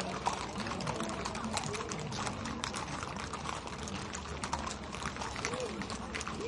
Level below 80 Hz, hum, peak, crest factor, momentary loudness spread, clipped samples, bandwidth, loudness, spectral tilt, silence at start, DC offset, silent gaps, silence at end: -52 dBFS; none; -14 dBFS; 24 dB; 4 LU; under 0.1%; 11.5 kHz; -38 LUFS; -3.5 dB/octave; 0 s; under 0.1%; none; 0 s